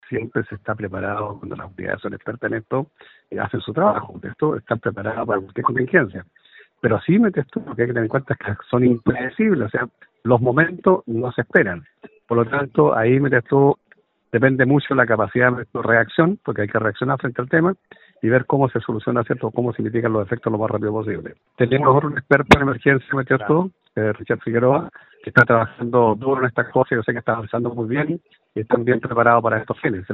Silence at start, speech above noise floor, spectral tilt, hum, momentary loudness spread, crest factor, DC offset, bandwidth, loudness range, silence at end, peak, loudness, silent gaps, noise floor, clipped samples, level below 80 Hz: 0.1 s; 37 dB; -6 dB/octave; none; 11 LU; 20 dB; under 0.1%; 7.2 kHz; 5 LU; 0 s; 0 dBFS; -20 LUFS; none; -56 dBFS; under 0.1%; -50 dBFS